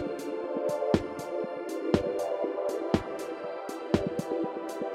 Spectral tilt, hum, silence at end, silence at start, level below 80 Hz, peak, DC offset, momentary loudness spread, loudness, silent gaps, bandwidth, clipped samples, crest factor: -6.5 dB/octave; none; 0 s; 0 s; -56 dBFS; -8 dBFS; under 0.1%; 8 LU; -32 LUFS; none; 16 kHz; under 0.1%; 22 dB